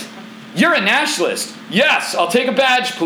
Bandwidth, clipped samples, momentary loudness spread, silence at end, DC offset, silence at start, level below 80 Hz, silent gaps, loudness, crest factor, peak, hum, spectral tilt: over 20 kHz; under 0.1%; 12 LU; 0 s; under 0.1%; 0 s; -66 dBFS; none; -15 LUFS; 16 dB; -2 dBFS; none; -3 dB/octave